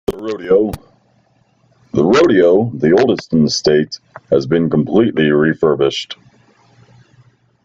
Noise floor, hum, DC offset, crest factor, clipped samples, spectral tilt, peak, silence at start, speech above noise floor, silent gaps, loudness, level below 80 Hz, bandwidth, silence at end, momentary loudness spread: -56 dBFS; none; under 0.1%; 14 dB; under 0.1%; -6 dB/octave; -2 dBFS; 0.1 s; 43 dB; none; -14 LUFS; -46 dBFS; 7.8 kHz; 1.5 s; 13 LU